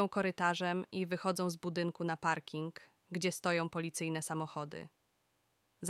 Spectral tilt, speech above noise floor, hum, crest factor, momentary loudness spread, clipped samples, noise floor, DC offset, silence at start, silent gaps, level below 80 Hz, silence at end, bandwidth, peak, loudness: -4.5 dB/octave; 41 dB; none; 20 dB; 12 LU; under 0.1%; -78 dBFS; under 0.1%; 0 s; none; -78 dBFS; 0 s; 15 kHz; -18 dBFS; -37 LUFS